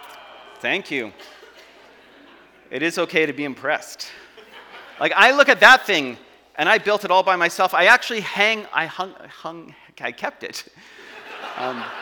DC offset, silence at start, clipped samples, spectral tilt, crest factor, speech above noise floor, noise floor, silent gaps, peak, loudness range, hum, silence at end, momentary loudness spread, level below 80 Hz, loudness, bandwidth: under 0.1%; 0 s; under 0.1%; -2.5 dB/octave; 22 dB; 29 dB; -49 dBFS; none; 0 dBFS; 10 LU; none; 0 s; 22 LU; -66 dBFS; -18 LUFS; 19.5 kHz